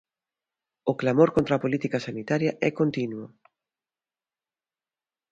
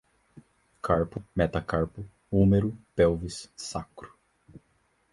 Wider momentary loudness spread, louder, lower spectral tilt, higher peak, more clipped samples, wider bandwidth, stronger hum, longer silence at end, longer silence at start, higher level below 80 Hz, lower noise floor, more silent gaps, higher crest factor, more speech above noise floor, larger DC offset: second, 11 LU vs 16 LU; first, -25 LUFS vs -28 LUFS; about the same, -7.5 dB/octave vs -7 dB/octave; first, -6 dBFS vs -10 dBFS; neither; second, 7.8 kHz vs 11.5 kHz; neither; first, 2.05 s vs 1.05 s; first, 0.85 s vs 0.35 s; second, -62 dBFS vs -44 dBFS; first, under -90 dBFS vs -69 dBFS; neither; about the same, 22 dB vs 20 dB; first, over 65 dB vs 43 dB; neither